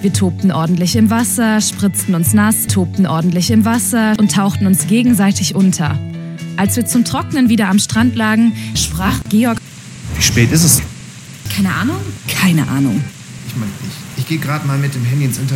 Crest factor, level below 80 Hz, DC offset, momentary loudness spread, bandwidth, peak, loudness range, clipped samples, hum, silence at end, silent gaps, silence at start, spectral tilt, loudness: 14 dB; -38 dBFS; under 0.1%; 12 LU; 17 kHz; 0 dBFS; 5 LU; under 0.1%; none; 0 s; none; 0 s; -4.5 dB/octave; -14 LUFS